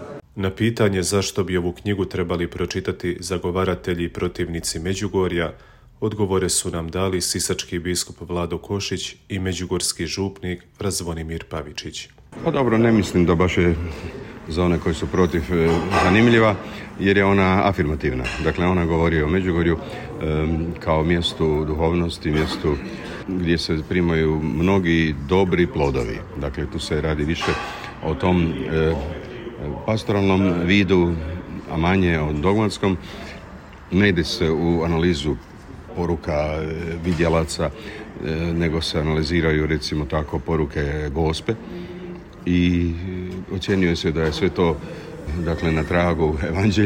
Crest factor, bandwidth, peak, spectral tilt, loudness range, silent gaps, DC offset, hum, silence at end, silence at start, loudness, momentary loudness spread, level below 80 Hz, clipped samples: 16 dB; 16 kHz; -6 dBFS; -5.5 dB/octave; 5 LU; none; under 0.1%; none; 0 s; 0 s; -21 LUFS; 12 LU; -36 dBFS; under 0.1%